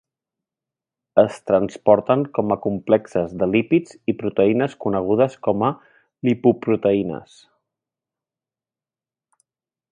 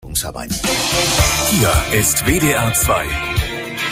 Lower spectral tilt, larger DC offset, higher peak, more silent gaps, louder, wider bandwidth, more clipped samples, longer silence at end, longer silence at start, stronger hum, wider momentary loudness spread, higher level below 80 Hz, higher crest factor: first, -8 dB/octave vs -3 dB/octave; neither; about the same, 0 dBFS vs -2 dBFS; neither; second, -20 LUFS vs -15 LUFS; second, 10.5 kHz vs 16 kHz; neither; first, 2.75 s vs 0 s; first, 1.15 s vs 0.05 s; neither; about the same, 7 LU vs 8 LU; second, -56 dBFS vs -28 dBFS; about the same, 20 dB vs 16 dB